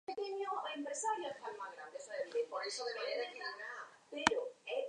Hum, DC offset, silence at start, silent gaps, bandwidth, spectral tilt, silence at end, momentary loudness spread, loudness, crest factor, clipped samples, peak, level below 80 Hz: none; under 0.1%; 0.1 s; none; 10.5 kHz; -1.5 dB/octave; 0 s; 12 LU; -41 LUFS; 32 dB; under 0.1%; -10 dBFS; -76 dBFS